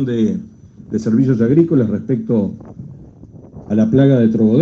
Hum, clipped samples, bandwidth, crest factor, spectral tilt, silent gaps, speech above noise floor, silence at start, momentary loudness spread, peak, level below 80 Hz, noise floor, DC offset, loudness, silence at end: none; under 0.1%; 7.2 kHz; 14 dB; -9.5 dB/octave; none; 25 dB; 0 s; 18 LU; 0 dBFS; -50 dBFS; -39 dBFS; under 0.1%; -15 LUFS; 0 s